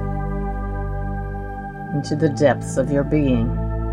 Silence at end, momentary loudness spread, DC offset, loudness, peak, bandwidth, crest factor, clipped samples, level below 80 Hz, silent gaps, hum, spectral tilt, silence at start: 0 s; 11 LU; under 0.1%; -22 LUFS; -4 dBFS; 11 kHz; 18 dB; under 0.1%; -28 dBFS; none; 50 Hz at -35 dBFS; -7.5 dB/octave; 0 s